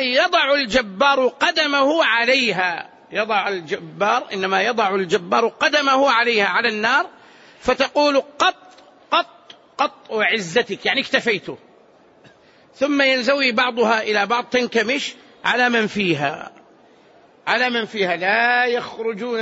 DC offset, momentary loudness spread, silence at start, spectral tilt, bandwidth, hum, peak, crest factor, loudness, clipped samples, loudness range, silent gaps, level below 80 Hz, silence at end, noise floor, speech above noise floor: under 0.1%; 9 LU; 0 s; -3.5 dB/octave; 8 kHz; none; -4 dBFS; 16 dB; -18 LUFS; under 0.1%; 4 LU; none; -58 dBFS; 0 s; -51 dBFS; 32 dB